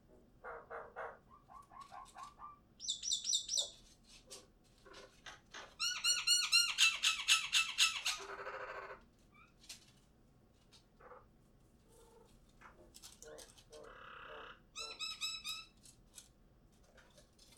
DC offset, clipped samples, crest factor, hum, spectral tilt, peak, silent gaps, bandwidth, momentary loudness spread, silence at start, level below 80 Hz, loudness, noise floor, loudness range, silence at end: under 0.1%; under 0.1%; 26 dB; none; 2 dB/octave; -16 dBFS; none; 19 kHz; 26 LU; 0.1 s; -70 dBFS; -34 LUFS; -68 dBFS; 21 LU; 0.4 s